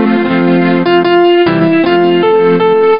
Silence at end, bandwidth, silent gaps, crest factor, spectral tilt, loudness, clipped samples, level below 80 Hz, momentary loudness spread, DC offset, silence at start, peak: 0 s; 5.4 kHz; none; 8 dB; -11.5 dB/octave; -9 LUFS; under 0.1%; -50 dBFS; 2 LU; 1%; 0 s; 0 dBFS